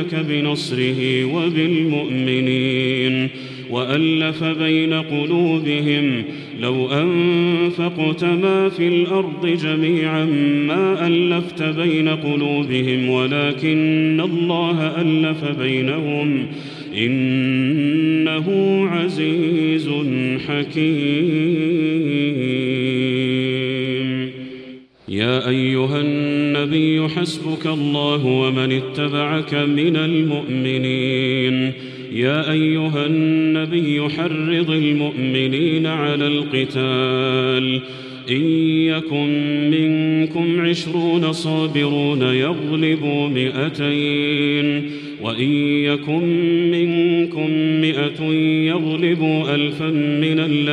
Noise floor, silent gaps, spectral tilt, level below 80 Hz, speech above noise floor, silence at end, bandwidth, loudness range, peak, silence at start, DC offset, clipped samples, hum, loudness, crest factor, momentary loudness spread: -39 dBFS; none; -7 dB/octave; -62 dBFS; 21 dB; 0 s; 10 kHz; 1 LU; -4 dBFS; 0 s; under 0.1%; under 0.1%; none; -18 LUFS; 14 dB; 4 LU